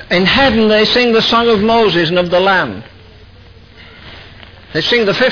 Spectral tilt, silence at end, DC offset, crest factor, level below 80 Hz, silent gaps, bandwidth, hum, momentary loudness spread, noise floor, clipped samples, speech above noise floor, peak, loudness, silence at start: -5.5 dB/octave; 0 s; under 0.1%; 12 dB; -38 dBFS; none; 5.4 kHz; none; 7 LU; -39 dBFS; under 0.1%; 28 dB; -2 dBFS; -11 LUFS; 0 s